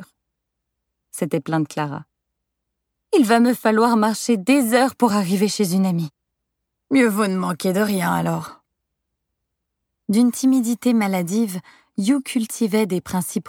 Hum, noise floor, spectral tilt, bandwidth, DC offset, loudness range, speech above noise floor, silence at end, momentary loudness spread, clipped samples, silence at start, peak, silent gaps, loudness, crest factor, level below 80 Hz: none; -79 dBFS; -5.5 dB/octave; 18 kHz; under 0.1%; 5 LU; 60 dB; 0 s; 11 LU; under 0.1%; 0 s; -2 dBFS; none; -20 LUFS; 18 dB; -64 dBFS